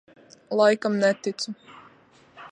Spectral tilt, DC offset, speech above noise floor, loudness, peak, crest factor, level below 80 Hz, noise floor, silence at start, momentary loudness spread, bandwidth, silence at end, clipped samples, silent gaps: -4.5 dB/octave; under 0.1%; 33 dB; -24 LUFS; -6 dBFS; 20 dB; -78 dBFS; -56 dBFS; 0.5 s; 13 LU; 10 kHz; 0.05 s; under 0.1%; none